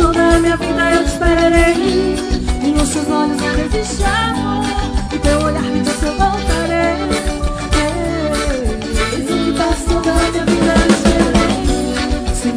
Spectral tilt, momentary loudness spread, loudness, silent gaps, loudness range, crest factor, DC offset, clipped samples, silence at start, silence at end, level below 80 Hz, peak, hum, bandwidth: -5 dB/octave; 7 LU; -15 LUFS; none; 3 LU; 14 dB; under 0.1%; under 0.1%; 0 s; 0 s; -22 dBFS; 0 dBFS; none; 11 kHz